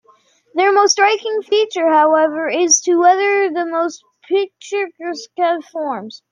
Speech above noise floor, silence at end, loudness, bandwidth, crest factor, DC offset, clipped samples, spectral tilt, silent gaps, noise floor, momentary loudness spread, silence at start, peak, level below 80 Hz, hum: 38 dB; 0.15 s; -16 LUFS; 11 kHz; 14 dB; under 0.1%; under 0.1%; -0.5 dB/octave; none; -54 dBFS; 12 LU; 0.55 s; -2 dBFS; -76 dBFS; none